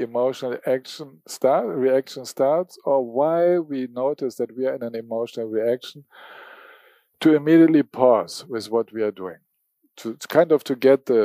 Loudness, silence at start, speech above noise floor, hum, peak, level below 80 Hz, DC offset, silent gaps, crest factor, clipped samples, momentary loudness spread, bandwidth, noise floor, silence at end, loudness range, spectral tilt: -21 LUFS; 0 s; 48 dB; none; -2 dBFS; -80 dBFS; under 0.1%; none; 20 dB; under 0.1%; 16 LU; 15.5 kHz; -69 dBFS; 0 s; 6 LU; -6 dB/octave